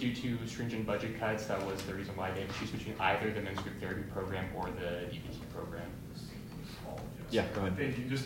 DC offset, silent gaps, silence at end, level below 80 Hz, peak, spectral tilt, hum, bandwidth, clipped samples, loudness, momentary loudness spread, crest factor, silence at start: under 0.1%; none; 0 s; -56 dBFS; -16 dBFS; -6 dB/octave; none; 16 kHz; under 0.1%; -38 LUFS; 11 LU; 20 dB; 0 s